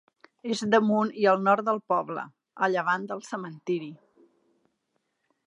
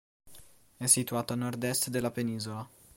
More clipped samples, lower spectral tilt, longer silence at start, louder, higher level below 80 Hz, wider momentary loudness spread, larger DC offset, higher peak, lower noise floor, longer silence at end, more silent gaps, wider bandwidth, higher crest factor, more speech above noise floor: neither; first, -5.5 dB/octave vs -3.5 dB/octave; first, 0.45 s vs 0.25 s; first, -26 LUFS vs -30 LUFS; second, -80 dBFS vs -66 dBFS; about the same, 14 LU vs 12 LU; neither; about the same, -8 dBFS vs -10 dBFS; first, -77 dBFS vs -56 dBFS; first, 1.5 s vs 0.3 s; neither; second, 11 kHz vs 16.5 kHz; about the same, 20 dB vs 24 dB; first, 51 dB vs 25 dB